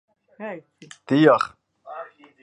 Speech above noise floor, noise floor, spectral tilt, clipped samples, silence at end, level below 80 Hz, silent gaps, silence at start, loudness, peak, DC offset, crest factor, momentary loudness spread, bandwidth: 19 dB; -40 dBFS; -7 dB/octave; under 0.1%; 0.4 s; -70 dBFS; none; 0.4 s; -19 LUFS; -2 dBFS; under 0.1%; 22 dB; 23 LU; 10.5 kHz